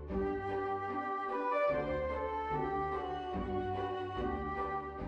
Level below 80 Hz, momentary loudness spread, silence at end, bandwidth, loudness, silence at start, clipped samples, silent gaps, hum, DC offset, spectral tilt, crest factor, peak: -50 dBFS; 5 LU; 0 s; 7.6 kHz; -36 LUFS; 0 s; under 0.1%; none; none; under 0.1%; -8 dB/octave; 14 dB; -22 dBFS